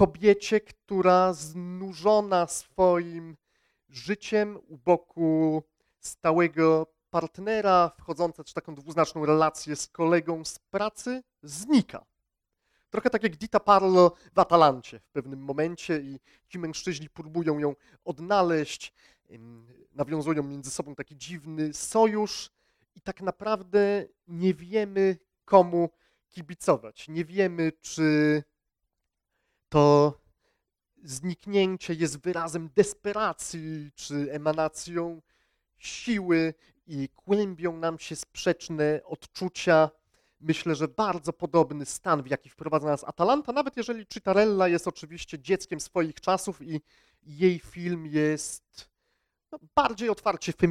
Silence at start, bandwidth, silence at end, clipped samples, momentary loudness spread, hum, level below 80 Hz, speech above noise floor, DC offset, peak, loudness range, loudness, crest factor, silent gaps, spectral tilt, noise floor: 0 s; 15 kHz; 0 s; under 0.1%; 16 LU; none; -60 dBFS; 56 dB; under 0.1%; -4 dBFS; 6 LU; -27 LUFS; 24 dB; none; -5.5 dB/octave; -82 dBFS